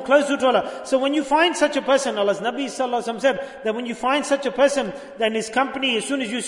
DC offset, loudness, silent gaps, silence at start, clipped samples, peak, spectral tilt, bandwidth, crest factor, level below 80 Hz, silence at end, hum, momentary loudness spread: under 0.1%; -21 LUFS; none; 0 s; under 0.1%; -4 dBFS; -3 dB/octave; 11 kHz; 16 dB; -62 dBFS; 0 s; none; 7 LU